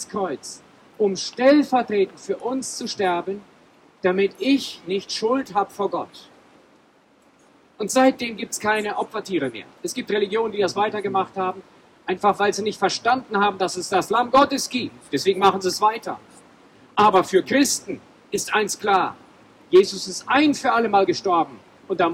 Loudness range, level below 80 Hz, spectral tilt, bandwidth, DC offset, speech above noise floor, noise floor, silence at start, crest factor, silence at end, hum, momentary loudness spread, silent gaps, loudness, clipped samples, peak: 5 LU; -64 dBFS; -3.5 dB/octave; 16.5 kHz; under 0.1%; 35 dB; -57 dBFS; 0 s; 16 dB; 0 s; none; 12 LU; none; -21 LUFS; under 0.1%; -6 dBFS